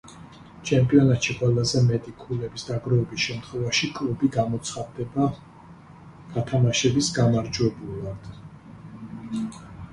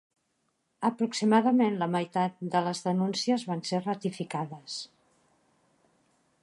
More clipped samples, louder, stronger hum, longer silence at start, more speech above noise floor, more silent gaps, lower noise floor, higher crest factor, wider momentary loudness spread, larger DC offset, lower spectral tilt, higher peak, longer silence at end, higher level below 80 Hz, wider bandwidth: neither; first, -24 LUFS vs -29 LUFS; neither; second, 0.05 s vs 0.8 s; second, 23 dB vs 48 dB; neither; second, -47 dBFS vs -76 dBFS; about the same, 20 dB vs 20 dB; first, 21 LU vs 12 LU; neither; about the same, -5.5 dB/octave vs -5.5 dB/octave; first, -6 dBFS vs -10 dBFS; second, 0 s vs 1.55 s; first, -50 dBFS vs -80 dBFS; about the same, 11 kHz vs 11.5 kHz